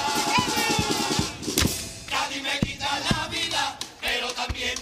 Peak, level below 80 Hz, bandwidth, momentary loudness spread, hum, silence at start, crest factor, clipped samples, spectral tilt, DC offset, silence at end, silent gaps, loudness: -4 dBFS; -44 dBFS; 15.5 kHz; 6 LU; none; 0 s; 22 dB; under 0.1%; -2.5 dB/octave; under 0.1%; 0 s; none; -25 LUFS